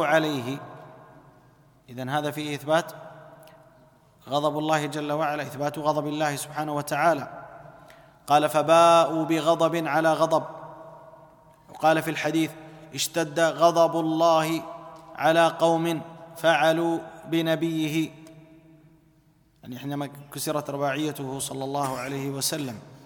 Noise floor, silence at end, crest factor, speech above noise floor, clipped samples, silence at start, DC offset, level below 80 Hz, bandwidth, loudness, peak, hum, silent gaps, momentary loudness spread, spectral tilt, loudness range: -61 dBFS; 0.1 s; 20 dB; 37 dB; under 0.1%; 0 s; under 0.1%; -68 dBFS; 19 kHz; -24 LUFS; -6 dBFS; none; none; 19 LU; -4.5 dB/octave; 10 LU